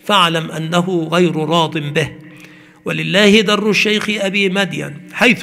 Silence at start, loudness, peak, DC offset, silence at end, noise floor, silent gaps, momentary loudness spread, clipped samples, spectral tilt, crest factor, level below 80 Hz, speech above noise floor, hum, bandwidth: 0.05 s; -14 LUFS; 0 dBFS; under 0.1%; 0 s; -41 dBFS; none; 11 LU; under 0.1%; -4.5 dB/octave; 16 dB; -54 dBFS; 26 dB; none; 16 kHz